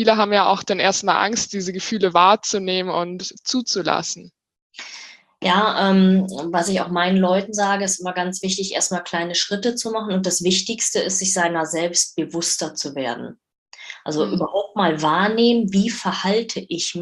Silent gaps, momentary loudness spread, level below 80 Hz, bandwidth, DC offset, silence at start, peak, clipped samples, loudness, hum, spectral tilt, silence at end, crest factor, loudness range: 4.62-4.70 s, 13.58-13.66 s; 10 LU; -62 dBFS; 12.5 kHz; under 0.1%; 0 s; -2 dBFS; under 0.1%; -20 LUFS; none; -3.5 dB/octave; 0 s; 20 dB; 4 LU